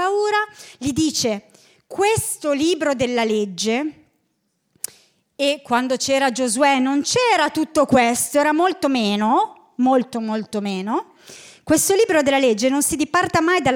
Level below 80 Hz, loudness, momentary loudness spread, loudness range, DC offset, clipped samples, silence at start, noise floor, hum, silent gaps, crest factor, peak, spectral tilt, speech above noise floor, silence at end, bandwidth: -56 dBFS; -19 LUFS; 10 LU; 5 LU; under 0.1%; under 0.1%; 0 s; -70 dBFS; none; none; 16 dB; -4 dBFS; -3.5 dB/octave; 51 dB; 0 s; 18 kHz